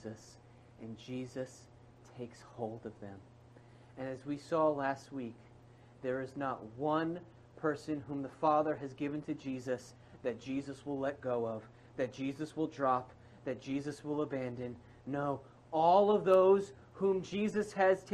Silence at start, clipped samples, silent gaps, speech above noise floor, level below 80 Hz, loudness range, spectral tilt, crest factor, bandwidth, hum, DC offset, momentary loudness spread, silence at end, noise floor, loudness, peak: 0 s; under 0.1%; none; 24 dB; -70 dBFS; 15 LU; -6.5 dB/octave; 22 dB; 10.5 kHz; none; under 0.1%; 20 LU; 0 s; -59 dBFS; -35 LUFS; -14 dBFS